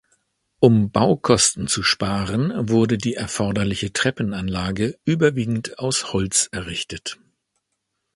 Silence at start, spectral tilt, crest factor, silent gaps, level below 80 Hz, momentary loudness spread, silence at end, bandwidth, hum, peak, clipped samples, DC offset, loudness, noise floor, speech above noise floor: 0.6 s; -4 dB/octave; 22 dB; none; -46 dBFS; 9 LU; 1 s; 11.5 kHz; none; 0 dBFS; under 0.1%; under 0.1%; -20 LUFS; -76 dBFS; 56 dB